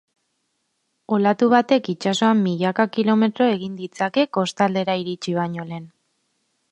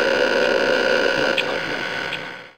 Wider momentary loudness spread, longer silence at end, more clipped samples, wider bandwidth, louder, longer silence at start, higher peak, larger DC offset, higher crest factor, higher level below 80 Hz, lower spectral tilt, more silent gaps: about the same, 9 LU vs 8 LU; first, 0.85 s vs 0.05 s; neither; second, 9 kHz vs 16 kHz; about the same, -20 LUFS vs -20 LUFS; first, 1.1 s vs 0 s; about the same, -2 dBFS vs -4 dBFS; second, under 0.1% vs 0.5%; about the same, 18 dB vs 16 dB; second, -66 dBFS vs -54 dBFS; first, -6 dB/octave vs -3 dB/octave; neither